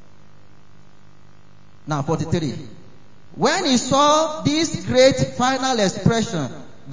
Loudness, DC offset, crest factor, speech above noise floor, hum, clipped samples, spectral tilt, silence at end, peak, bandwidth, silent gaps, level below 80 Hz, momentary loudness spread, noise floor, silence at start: -19 LUFS; 1%; 18 dB; 32 dB; 50 Hz at -50 dBFS; under 0.1%; -4.5 dB/octave; 0 s; -2 dBFS; 7.8 kHz; none; -48 dBFS; 13 LU; -51 dBFS; 1.85 s